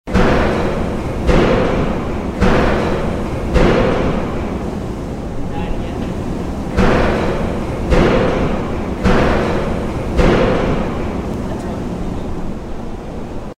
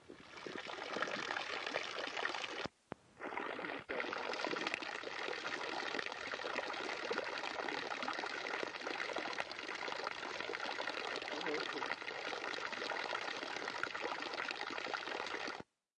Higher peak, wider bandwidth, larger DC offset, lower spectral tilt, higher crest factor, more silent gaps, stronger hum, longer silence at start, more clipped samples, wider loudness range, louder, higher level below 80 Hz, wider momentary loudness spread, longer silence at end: first, 0 dBFS vs -22 dBFS; first, 12.5 kHz vs 11 kHz; neither; first, -7 dB/octave vs -2 dB/octave; second, 16 dB vs 22 dB; neither; neither; about the same, 0.05 s vs 0 s; neither; first, 4 LU vs 1 LU; first, -17 LUFS vs -41 LUFS; first, -22 dBFS vs -82 dBFS; first, 11 LU vs 4 LU; second, 0.05 s vs 0.35 s